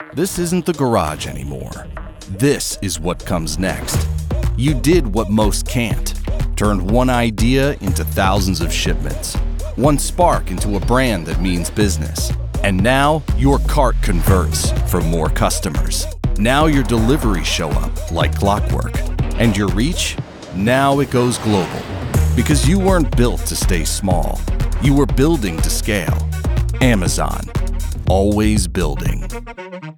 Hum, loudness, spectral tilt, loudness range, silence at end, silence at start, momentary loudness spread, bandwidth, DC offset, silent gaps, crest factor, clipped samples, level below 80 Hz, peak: none; -17 LUFS; -5 dB/octave; 2 LU; 0.05 s; 0 s; 8 LU; 18 kHz; under 0.1%; none; 16 dB; under 0.1%; -22 dBFS; 0 dBFS